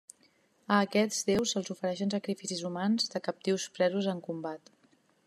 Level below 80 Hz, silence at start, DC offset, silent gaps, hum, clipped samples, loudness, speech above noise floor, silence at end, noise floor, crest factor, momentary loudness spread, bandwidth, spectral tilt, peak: -74 dBFS; 0.7 s; under 0.1%; none; none; under 0.1%; -31 LUFS; 37 dB; 0.7 s; -68 dBFS; 22 dB; 8 LU; 13.5 kHz; -4 dB/octave; -10 dBFS